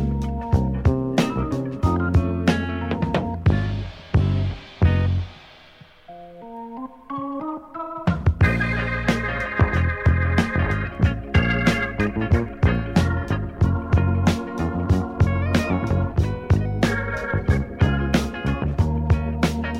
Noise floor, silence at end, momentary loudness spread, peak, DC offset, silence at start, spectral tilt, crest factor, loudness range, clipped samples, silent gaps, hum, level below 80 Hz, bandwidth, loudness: -48 dBFS; 0 s; 9 LU; -2 dBFS; under 0.1%; 0 s; -7 dB/octave; 18 dB; 4 LU; under 0.1%; none; none; -30 dBFS; 12 kHz; -22 LUFS